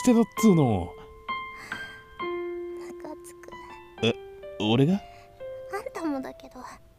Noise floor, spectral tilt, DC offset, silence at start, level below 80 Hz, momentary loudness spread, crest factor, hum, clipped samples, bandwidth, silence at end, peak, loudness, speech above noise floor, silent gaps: -45 dBFS; -6 dB/octave; under 0.1%; 0 s; -56 dBFS; 22 LU; 20 dB; none; under 0.1%; 15.5 kHz; 0.2 s; -8 dBFS; -27 LUFS; 23 dB; none